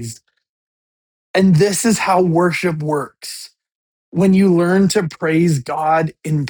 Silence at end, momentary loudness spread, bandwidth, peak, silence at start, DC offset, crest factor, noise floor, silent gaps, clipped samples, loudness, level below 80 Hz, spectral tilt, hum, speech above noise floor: 0 s; 14 LU; 19 kHz; -2 dBFS; 0 s; under 0.1%; 16 dB; under -90 dBFS; 0.49-1.34 s, 3.75-4.12 s; under 0.1%; -15 LUFS; -52 dBFS; -6 dB/octave; none; over 75 dB